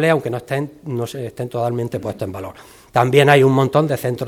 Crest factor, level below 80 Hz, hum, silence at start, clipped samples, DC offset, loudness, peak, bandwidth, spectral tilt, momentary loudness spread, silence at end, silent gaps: 18 dB; -56 dBFS; none; 0 s; under 0.1%; under 0.1%; -18 LUFS; 0 dBFS; 17 kHz; -6.5 dB/octave; 15 LU; 0 s; none